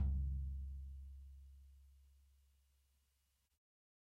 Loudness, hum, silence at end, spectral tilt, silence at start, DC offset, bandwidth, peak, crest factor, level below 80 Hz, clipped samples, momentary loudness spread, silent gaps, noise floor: -47 LUFS; none; 2 s; -9.5 dB/octave; 0 s; under 0.1%; 1 kHz; -30 dBFS; 16 dB; -48 dBFS; under 0.1%; 23 LU; none; -82 dBFS